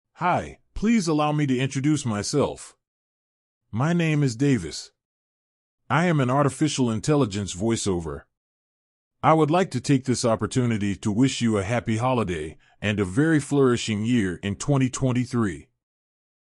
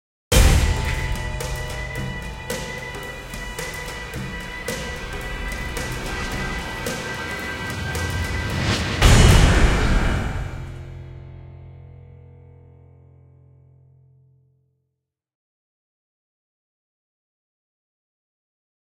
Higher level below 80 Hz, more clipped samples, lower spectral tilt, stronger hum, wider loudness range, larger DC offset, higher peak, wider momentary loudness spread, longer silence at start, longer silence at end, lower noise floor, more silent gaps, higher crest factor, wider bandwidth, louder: second, -50 dBFS vs -26 dBFS; neither; first, -6 dB/octave vs -4.5 dB/octave; neither; second, 3 LU vs 11 LU; neither; second, -6 dBFS vs 0 dBFS; second, 8 LU vs 20 LU; about the same, 0.2 s vs 0.3 s; second, 0.95 s vs 6.55 s; first, under -90 dBFS vs -80 dBFS; first, 2.88-3.61 s, 5.05-5.78 s, 8.37-9.11 s vs none; about the same, 18 dB vs 22 dB; second, 12 kHz vs 17 kHz; about the same, -23 LUFS vs -23 LUFS